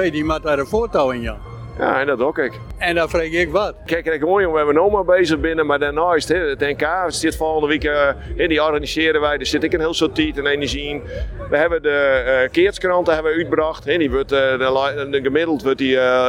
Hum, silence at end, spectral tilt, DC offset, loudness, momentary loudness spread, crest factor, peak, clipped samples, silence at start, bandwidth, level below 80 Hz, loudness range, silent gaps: none; 0 s; -5 dB/octave; under 0.1%; -18 LUFS; 6 LU; 14 dB; -4 dBFS; under 0.1%; 0 s; 16.5 kHz; -36 dBFS; 2 LU; none